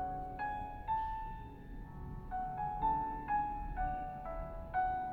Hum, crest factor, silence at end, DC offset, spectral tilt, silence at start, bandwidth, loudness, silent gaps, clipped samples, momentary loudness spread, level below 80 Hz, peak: none; 14 dB; 0 s; under 0.1%; -8 dB/octave; 0 s; 4.8 kHz; -39 LUFS; none; under 0.1%; 13 LU; -48 dBFS; -24 dBFS